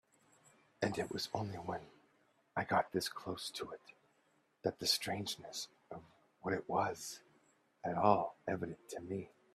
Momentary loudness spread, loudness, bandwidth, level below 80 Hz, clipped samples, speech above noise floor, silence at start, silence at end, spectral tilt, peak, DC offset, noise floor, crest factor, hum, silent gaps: 14 LU; -39 LUFS; 15 kHz; -76 dBFS; under 0.1%; 37 dB; 0.8 s; 0.25 s; -4 dB/octave; -14 dBFS; under 0.1%; -75 dBFS; 26 dB; none; none